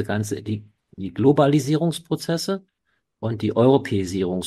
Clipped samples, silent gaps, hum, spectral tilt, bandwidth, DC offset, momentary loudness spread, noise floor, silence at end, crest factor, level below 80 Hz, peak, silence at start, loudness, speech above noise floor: under 0.1%; none; none; -6.5 dB/octave; 14.5 kHz; under 0.1%; 14 LU; -73 dBFS; 0 s; 18 dB; -56 dBFS; -4 dBFS; 0 s; -22 LUFS; 52 dB